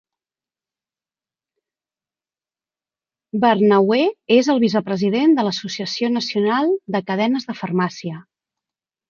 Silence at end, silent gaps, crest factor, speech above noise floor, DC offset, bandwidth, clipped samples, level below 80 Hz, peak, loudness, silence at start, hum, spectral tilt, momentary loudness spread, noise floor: 0.9 s; none; 18 dB; over 72 dB; under 0.1%; 7.2 kHz; under 0.1%; -68 dBFS; -2 dBFS; -18 LUFS; 3.35 s; none; -6 dB/octave; 10 LU; under -90 dBFS